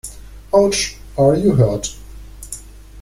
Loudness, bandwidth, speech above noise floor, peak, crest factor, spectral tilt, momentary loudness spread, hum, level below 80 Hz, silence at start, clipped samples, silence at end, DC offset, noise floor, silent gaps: -16 LUFS; 16 kHz; 21 dB; -2 dBFS; 16 dB; -5.5 dB/octave; 19 LU; none; -36 dBFS; 0.05 s; under 0.1%; 0 s; under 0.1%; -35 dBFS; none